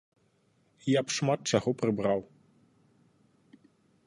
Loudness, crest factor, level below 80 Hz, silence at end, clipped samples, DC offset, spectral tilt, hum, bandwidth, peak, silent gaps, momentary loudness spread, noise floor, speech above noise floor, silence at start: -29 LUFS; 24 dB; -66 dBFS; 1.85 s; under 0.1%; under 0.1%; -5 dB/octave; none; 11.5 kHz; -10 dBFS; none; 5 LU; -69 dBFS; 41 dB; 0.85 s